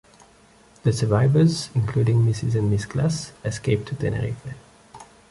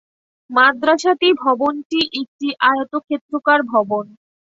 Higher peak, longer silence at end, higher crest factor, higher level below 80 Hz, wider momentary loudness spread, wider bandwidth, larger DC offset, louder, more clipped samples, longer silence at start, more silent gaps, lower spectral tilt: second, -4 dBFS vs 0 dBFS; second, 0.3 s vs 0.55 s; about the same, 18 dB vs 18 dB; first, -46 dBFS vs -64 dBFS; about the same, 11 LU vs 10 LU; first, 11.5 kHz vs 8 kHz; neither; second, -22 LUFS vs -17 LUFS; neither; first, 0.85 s vs 0.5 s; second, none vs 1.85-1.90 s, 2.28-2.39 s, 3.21-3.29 s; first, -6.5 dB/octave vs -3.5 dB/octave